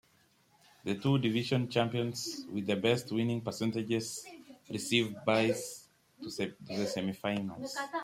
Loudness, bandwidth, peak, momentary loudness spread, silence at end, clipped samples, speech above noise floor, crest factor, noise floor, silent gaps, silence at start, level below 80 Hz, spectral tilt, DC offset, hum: -33 LUFS; 16 kHz; -14 dBFS; 14 LU; 0 s; under 0.1%; 35 dB; 20 dB; -68 dBFS; none; 0.85 s; -72 dBFS; -5 dB/octave; under 0.1%; none